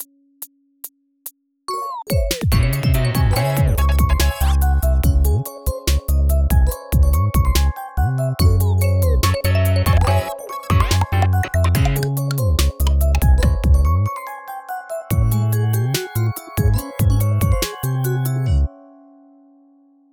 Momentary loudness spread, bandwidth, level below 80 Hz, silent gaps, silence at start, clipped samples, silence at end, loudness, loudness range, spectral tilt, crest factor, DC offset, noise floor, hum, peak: 13 LU; 18.5 kHz; -20 dBFS; none; 0 s; under 0.1%; 1.4 s; -18 LUFS; 3 LU; -5.5 dB/octave; 14 dB; under 0.1%; -53 dBFS; none; -2 dBFS